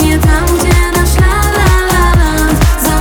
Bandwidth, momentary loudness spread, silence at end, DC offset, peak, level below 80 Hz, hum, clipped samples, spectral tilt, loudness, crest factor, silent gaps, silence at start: over 20 kHz; 1 LU; 0 s; under 0.1%; 0 dBFS; -12 dBFS; none; under 0.1%; -5 dB/octave; -10 LUFS; 8 dB; none; 0 s